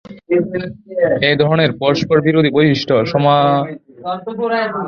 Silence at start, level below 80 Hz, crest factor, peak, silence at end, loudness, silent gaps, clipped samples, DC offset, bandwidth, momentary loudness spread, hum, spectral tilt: 0.1 s; -50 dBFS; 14 dB; 0 dBFS; 0 s; -15 LUFS; none; under 0.1%; under 0.1%; 6.8 kHz; 12 LU; none; -7 dB/octave